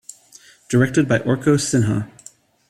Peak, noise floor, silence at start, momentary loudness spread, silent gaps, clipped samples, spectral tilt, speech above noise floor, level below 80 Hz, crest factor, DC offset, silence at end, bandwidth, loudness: -2 dBFS; -49 dBFS; 0.7 s; 11 LU; none; under 0.1%; -6 dB/octave; 31 dB; -52 dBFS; 18 dB; under 0.1%; 0.65 s; 14 kHz; -18 LUFS